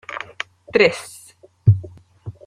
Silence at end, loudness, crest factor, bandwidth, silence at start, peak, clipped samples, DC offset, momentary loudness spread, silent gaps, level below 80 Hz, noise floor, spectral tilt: 0.15 s; -19 LUFS; 20 dB; 13 kHz; 0.1 s; 0 dBFS; under 0.1%; under 0.1%; 22 LU; none; -50 dBFS; -38 dBFS; -6 dB/octave